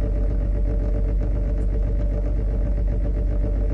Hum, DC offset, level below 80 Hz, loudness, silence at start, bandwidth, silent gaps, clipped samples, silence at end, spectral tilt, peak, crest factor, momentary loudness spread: none; under 0.1%; -22 dBFS; -25 LUFS; 0 s; 2.5 kHz; none; under 0.1%; 0 s; -10.5 dB/octave; -12 dBFS; 8 dB; 0 LU